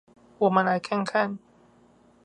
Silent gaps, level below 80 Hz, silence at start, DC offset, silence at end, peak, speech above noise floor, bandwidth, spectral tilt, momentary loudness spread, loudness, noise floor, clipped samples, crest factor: none; -72 dBFS; 0.4 s; under 0.1%; 0.9 s; -6 dBFS; 34 dB; 9.8 kHz; -6.5 dB/octave; 8 LU; -25 LUFS; -58 dBFS; under 0.1%; 20 dB